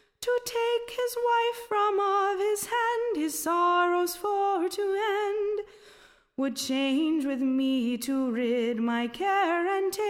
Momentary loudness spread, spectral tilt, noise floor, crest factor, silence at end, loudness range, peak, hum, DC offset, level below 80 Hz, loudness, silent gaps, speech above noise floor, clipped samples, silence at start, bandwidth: 5 LU; -3 dB/octave; -57 dBFS; 12 dB; 0 s; 3 LU; -14 dBFS; none; under 0.1%; -68 dBFS; -27 LUFS; none; 30 dB; under 0.1%; 0.2 s; 17 kHz